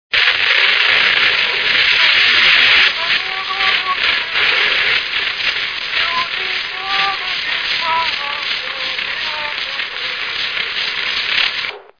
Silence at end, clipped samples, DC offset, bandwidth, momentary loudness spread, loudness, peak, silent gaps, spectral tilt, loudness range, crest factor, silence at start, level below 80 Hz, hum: 0.2 s; under 0.1%; 0.1%; 5.4 kHz; 10 LU; -13 LUFS; 0 dBFS; none; -0.5 dB/octave; 8 LU; 16 dB; 0.1 s; -50 dBFS; none